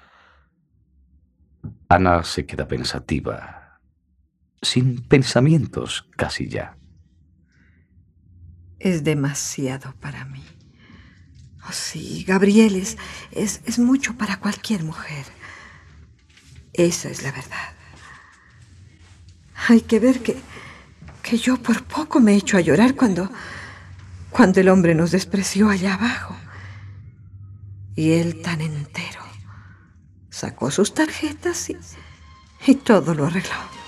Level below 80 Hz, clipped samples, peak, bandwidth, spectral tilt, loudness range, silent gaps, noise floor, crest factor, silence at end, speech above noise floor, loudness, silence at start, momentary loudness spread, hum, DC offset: -50 dBFS; under 0.1%; 0 dBFS; 14 kHz; -5.5 dB/octave; 9 LU; none; -63 dBFS; 20 dB; 0 s; 44 dB; -20 LUFS; 1.65 s; 23 LU; none; under 0.1%